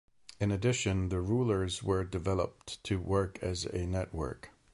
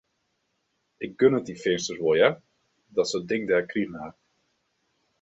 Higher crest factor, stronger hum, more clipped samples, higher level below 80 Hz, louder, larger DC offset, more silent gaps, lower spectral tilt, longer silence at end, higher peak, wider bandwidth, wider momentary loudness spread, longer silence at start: second, 16 dB vs 22 dB; neither; neither; first, -46 dBFS vs -66 dBFS; second, -33 LUFS vs -25 LUFS; neither; neither; about the same, -5.5 dB/octave vs -4.5 dB/octave; second, 0.25 s vs 1.1 s; second, -16 dBFS vs -6 dBFS; first, 11.5 kHz vs 8 kHz; second, 8 LU vs 17 LU; second, 0.4 s vs 1 s